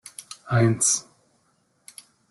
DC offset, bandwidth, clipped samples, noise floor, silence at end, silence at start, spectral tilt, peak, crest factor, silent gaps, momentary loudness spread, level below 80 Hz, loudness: under 0.1%; 12.5 kHz; under 0.1%; -67 dBFS; 1.3 s; 0.2 s; -4 dB/octave; -8 dBFS; 18 dB; none; 26 LU; -62 dBFS; -21 LUFS